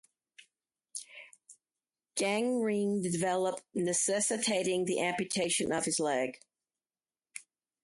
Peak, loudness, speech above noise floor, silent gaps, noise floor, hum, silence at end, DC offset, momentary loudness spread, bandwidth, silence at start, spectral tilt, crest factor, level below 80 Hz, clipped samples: -18 dBFS; -31 LUFS; over 59 dB; none; under -90 dBFS; none; 0.45 s; under 0.1%; 18 LU; 12 kHz; 0.95 s; -3 dB/octave; 16 dB; -74 dBFS; under 0.1%